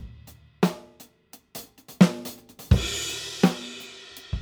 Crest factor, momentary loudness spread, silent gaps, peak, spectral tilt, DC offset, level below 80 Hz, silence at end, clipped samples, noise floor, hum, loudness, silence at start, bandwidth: 24 dB; 21 LU; none; -2 dBFS; -5.5 dB/octave; under 0.1%; -38 dBFS; 0 s; under 0.1%; -54 dBFS; none; -24 LUFS; 0 s; over 20 kHz